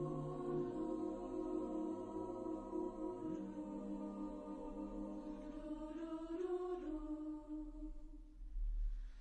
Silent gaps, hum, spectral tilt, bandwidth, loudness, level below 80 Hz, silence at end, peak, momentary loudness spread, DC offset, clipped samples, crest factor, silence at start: none; none; -8.5 dB/octave; 9 kHz; -46 LUFS; -52 dBFS; 0 s; -32 dBFS; 7 LU; under 0.1%; under 0.1%; 12 dB; 0 s